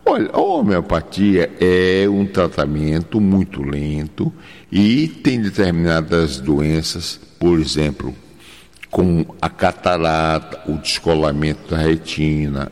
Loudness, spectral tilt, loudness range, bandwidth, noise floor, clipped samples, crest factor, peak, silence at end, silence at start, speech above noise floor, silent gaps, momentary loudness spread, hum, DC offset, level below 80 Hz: -18 LUFS; -6 dB/octave; 3 LU; 13.5 kHz; -43 dBFS; under 0.1%; 14 dB; -4 dBFS; 0.05 s; 0.05 s; 26 dB; none; 8 LU; none; 0.3%; -36 dBFS